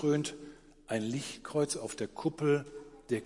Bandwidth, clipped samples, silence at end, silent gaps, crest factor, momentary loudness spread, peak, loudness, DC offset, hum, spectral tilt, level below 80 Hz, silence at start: 11.5 kHz; under 0.1%; 0 s; none; 16 dB; 18 LU; -18 dBFS; -34 LUFS; under 0.1%; none; -5 dB/octave; -64 dBFS; 0 s